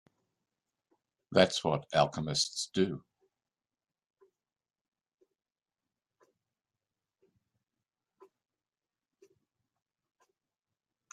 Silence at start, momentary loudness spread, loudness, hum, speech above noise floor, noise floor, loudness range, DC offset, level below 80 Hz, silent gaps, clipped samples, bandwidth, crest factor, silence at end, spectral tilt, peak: 1.3 s; 6 LU; -30 LUFS; none; over 60 dB; under -90 dBFS; 9 LU; under 0.1%; -72 dBFS; none; under 0.1%; 12.5 kHz; 30 dB; 8.15 s; -4 dB/octave; -8 dBFS